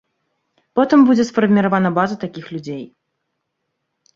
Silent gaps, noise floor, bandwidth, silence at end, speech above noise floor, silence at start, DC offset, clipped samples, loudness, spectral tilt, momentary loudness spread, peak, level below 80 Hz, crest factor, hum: none; -75 dBFS; 7.6 kHz; 1.3 s; 59 dB; 0.75 s; under 0.1%; under 0.1%; -15 LUFS; -7 dB/octave; 17 LU; -2 dBFS; -60 dBFS; 16 dB; none